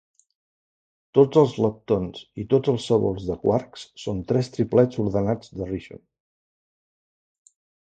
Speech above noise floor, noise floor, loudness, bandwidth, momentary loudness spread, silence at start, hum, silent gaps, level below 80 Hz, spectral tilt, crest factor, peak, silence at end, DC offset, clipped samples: over 68 dB; under -90 dBFS; -23 LUFS; 9 kHz; 13 LU; 1.15 s; none; none; -50 dBFS; -8 dB/octave; 22 dB; -4 dBFS; 1.85 s; under 0.1%; under 0.1%